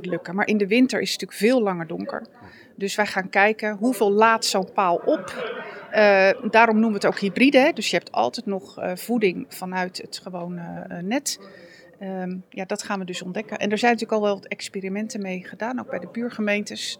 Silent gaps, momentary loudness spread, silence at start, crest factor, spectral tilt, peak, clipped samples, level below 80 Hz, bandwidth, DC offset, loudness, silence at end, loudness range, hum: none; 15 LU; 0 s; 20 dB; -4.5 dB/octave; -2 dBFS; under 0.1%; -78 dBFS; 20 kHz; under 0.1%; -22 LUFS; 0.05 s; 10 LU; none